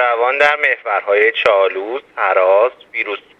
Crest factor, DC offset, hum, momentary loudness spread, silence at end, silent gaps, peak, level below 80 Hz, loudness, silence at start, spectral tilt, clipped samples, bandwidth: 16 dB; under 0.1%; none; 9 LU; 0.2 s; none; 0 dBFS; -64 dBFS; -14 LUFS; 0 s; -3 dB/octave; under 0.1%; 8.2 kHz